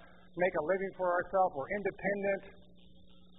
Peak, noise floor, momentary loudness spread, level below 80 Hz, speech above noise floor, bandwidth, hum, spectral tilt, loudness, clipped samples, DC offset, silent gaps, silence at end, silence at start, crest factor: -18 dBFS; -61 dBFS; 5 LU; -64 dBFS; 28 dB; 3.9 kHz; none; -0.5 dB/octave; -33 LUFS; under 0.1%; 0.1%; none; 0.85 s; 0 s; 18 dB